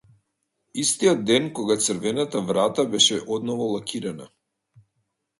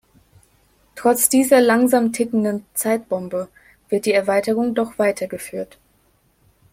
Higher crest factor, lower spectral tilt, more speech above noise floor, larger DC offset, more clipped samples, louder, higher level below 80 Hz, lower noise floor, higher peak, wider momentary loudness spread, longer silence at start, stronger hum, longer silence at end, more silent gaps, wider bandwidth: about the same, 20 dB vs 20 dB; about the same, -3 dB/octave vs -4 dB/octave; first, 53 dB vs 42 dB; neither; neither; second, -22 LUFS vs -19 LUFS; second, -66 dBFS vs -60 dBFS; first, -76 dBFS vs -60 dBFS; second, -4 dBFS vs 0 dBFS; second, 12 LU vs 15 LU; second, 0.75 s vs 0.95 s; neither; about the same, 1.15 s vs 1.05 s; neither; second, 11.5 kHz vs 16.5 kHz